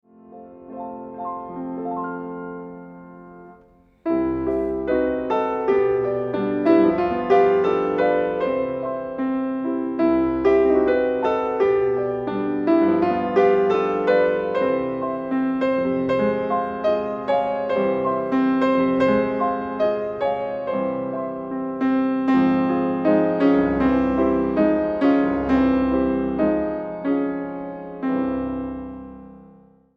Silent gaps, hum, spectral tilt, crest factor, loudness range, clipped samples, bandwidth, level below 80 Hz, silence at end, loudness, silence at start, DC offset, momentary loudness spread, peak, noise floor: none; none; -8.5 dB/octave; 16 dB; 7 LU; under 0.1%; 6 kHz; -48 dBFS; 0.5 s; -21 LUFS; 0.3 s; under 0.1%; 12 LU; -4 dBFS; -53 dBFS